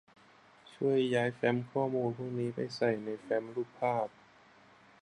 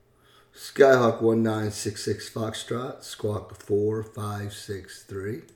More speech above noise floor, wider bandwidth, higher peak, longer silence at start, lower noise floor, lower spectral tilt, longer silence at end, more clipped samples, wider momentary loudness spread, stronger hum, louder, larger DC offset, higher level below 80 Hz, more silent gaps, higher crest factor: second, 28 dB vs 33 dB; second, 10.5 kHz vs 18 kHz; second, -16 dBFS vs -4 dBFS; first, 0.7 s vs 0.55 s; about the same, -61 dBFS vs -59 dBFS; first, -7 dB/octave vs -5.5 dB/octave; first, 0.95 s vs 0.15 s; neither; second, 6 LU vs 18 LU; neither; second, -33 LUFS vs -26 LUFS; neither; second, -76 dBFS vs -62 dBFS; neither; about the same, 18 dB vs 22 dB